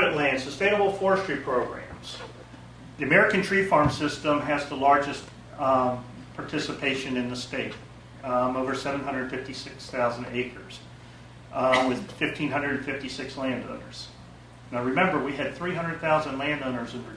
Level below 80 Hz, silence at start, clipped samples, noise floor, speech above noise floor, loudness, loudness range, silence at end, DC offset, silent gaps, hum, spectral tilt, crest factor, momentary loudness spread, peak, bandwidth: -54 dBFS; 0 s; under 0.1%; -47 dBFS; 20 dB; -26 LUFS; 6 LU; 0 s; under 0.1%; none; none; -5 dB/octave; 20 dB; 19 LU; -6 dBFS; 11 kHz